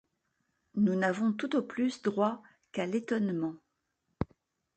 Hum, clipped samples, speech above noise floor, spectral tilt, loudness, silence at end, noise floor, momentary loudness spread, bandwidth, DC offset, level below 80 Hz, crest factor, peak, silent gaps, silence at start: none; under 0.1%; 50 dB; -7 dB/octave; -32 LUFS; 0.5 s; -81 dBFS; 11 LU; 8.8 kHz; under 0.1%; -60 dBFS; 18 dB; -14 dBFS; none; 0.75 s